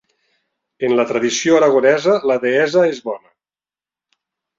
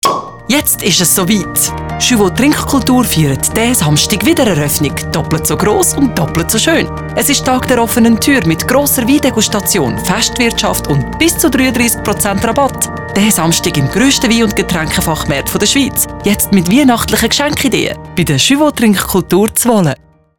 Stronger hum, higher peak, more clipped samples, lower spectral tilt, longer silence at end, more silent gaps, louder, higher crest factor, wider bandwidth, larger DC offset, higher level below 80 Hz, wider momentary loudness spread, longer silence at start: neither; about the same, -2 dBFS vs 0 dBFS; neither; about the same, -4 dB/octave vs -3.5 dB/octave; first, 1.4 s vs 0.45 s; neither; second, -15 LUFS vs -11 LUFS; about the same, 16 dB vs 12 dB; second, 7.8 kHz vs 19.5 kHz; second, under 0.1% vs 0.3%; second, -66 dBFS vs -32 dBFS; first, 12 LU vs 5 LU; first, 0.8 s vs 0.05 s